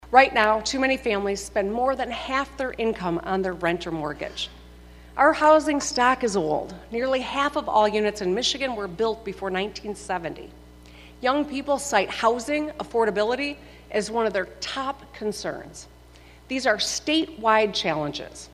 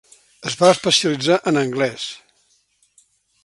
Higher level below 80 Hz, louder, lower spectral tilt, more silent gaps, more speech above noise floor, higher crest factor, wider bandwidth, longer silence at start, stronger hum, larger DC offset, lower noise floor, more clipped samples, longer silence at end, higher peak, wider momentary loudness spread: first, -50 dBFS vs -64 dBFS; second, -24 LUFS vs -18 LUFS; about the same, -3.5 dB/octave vs -3.5 dB/octave; neither; second, 25 dB vs 44 dB; about the same, 24 dB vs 20 dB; first, 14.5 kHz vs 11.5 kHz; second, 0 s vs 0.4 s; neither; neither; second, -49 dBFS vs -62 dBFS; neither; second, 0.05 s vs 1.3 s; about the same, 0 dBFS vs 0 dBFS; second, 11 LU vs 15 LU